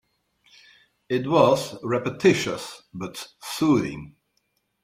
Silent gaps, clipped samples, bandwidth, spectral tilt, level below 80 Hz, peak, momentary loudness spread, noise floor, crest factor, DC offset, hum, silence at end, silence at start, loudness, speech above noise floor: none; under 0.1%; 16 kHz; -5.5 dB/octave; -60 dBFS; -4 dBFS; 17 LU; -72 dBFS; 22 dB; under 0.1%; none; 0.75 s; 1.1 s; -23 LUFS; 49 dB